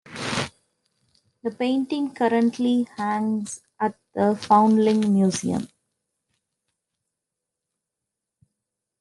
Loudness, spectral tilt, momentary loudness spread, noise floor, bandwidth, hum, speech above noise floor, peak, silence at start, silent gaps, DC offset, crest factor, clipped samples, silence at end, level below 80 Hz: -23 LUFS; -5.5 dB/octave; 12 LU; -85 dBFS; 11.5 kHz; none; 63 dB; -6 dBFS; 0.1 s; none; under 0.1%; 20 dB; under 0.1%; 3.35 s; -68 dBFS